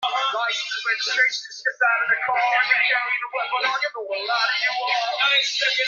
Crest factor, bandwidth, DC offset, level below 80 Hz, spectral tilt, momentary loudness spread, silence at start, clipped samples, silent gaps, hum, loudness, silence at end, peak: 18 dB; 7.6 kHz; under 0.1%; -82 dBFS; 2 dB/octave; 7 LU; 0 s; under 0.1%; none; none; -21 LUFS; 0 s; -6 dBFS